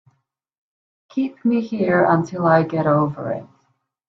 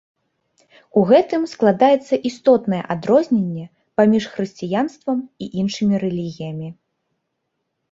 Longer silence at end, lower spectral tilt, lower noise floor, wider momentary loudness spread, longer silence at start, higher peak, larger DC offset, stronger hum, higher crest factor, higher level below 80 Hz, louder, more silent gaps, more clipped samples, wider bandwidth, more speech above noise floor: second, 0.65 s vs 1.2 s; first, -8.5 dB/octave vs -7 dB/octave; second, -69 dBFS vs -75 dBFS; about the same, 11 LU vs 13 LU; first, 1.15 s vs 0.95 s; about the same, -4 dBFS vs -2 dBFS; neither; neither; about the same, 18 dB vs 18 dB; about the same, -62 dBFS vs -62 dBFS; about the same, -19 LUFS vs -19 LUFS; neither; neither; second, 6.8 kHz vs 7.8 kHz; second, 50 dB vs 57 dB